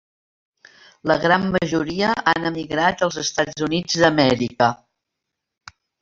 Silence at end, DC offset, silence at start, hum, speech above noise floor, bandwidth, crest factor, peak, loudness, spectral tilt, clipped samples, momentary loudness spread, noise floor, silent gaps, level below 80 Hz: 1.25 s; under 0.1%; 1.05 s; none; 62 dB; 7.8 kHz; 20 dB; -2 dBFS; -20 LUFS; -4.5 dB/octave; under 0.1%; 5 LU; -81 dBFS; none; -52 dBFS